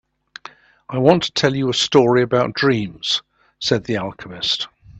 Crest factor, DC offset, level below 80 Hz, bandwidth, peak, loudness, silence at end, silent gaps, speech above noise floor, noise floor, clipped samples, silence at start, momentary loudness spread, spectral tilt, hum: 20 dB; under 0.1%; -54 dBFS; 8.6 kHz; 0 dBFS; -18 LUFS; 0 s; none; 25 dB; -43 dBFS; under 0.1%; 0.9 s; 13 LU; -4.5 dB/octave; none